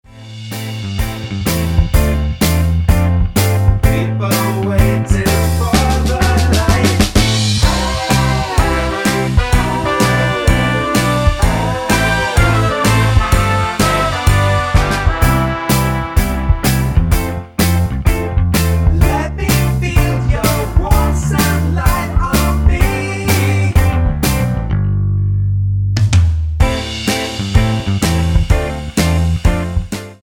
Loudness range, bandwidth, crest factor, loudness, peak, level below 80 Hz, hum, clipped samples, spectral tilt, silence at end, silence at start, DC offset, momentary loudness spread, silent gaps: 2 LU; 19.5 kHz; 14 dB; -14 LUFS; 0 dBFS; -18 dBFS; none; under 0.1%; -5.5 dB/octave; 0.05 s; 0.15 s; under 0.1%; 4 LU; none